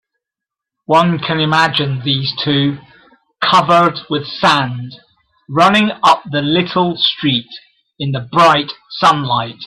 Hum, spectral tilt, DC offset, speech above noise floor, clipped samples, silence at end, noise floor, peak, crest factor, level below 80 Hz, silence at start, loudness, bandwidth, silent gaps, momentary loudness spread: none; -5.5 dB/octave; under 0.1%; 70 dB; under 0.1%; 0 s; -84 dBFS; 0 dBFS; 16 dB; -54 dBFS; 0.9 s; -14 LUFS; 13 kHz; none; 11 LU